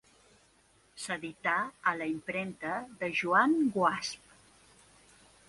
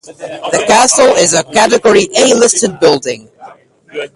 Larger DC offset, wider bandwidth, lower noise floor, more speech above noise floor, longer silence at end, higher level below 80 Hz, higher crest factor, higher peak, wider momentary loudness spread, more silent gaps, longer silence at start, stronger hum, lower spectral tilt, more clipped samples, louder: neither; about the same, 11.5 kHz vs 11.5 kHz; first, -66 dBFS vs -38 dBFS; first, 35 dB vs 29 dB; first, 1.35 s vs 0.1 s; second, -72 dBFS vs -50 dBFS; first, 22 dB vs 10 dB; second, -12 dBFS vs 0 dBFS; second, 12 LU vs 17 LU; neither; first, 0.95 s vs 0.1 s; neither; first, -4.5 dB/octave vs -2 dB/octave; neither; second, -31 LUFS vs -9 LUFS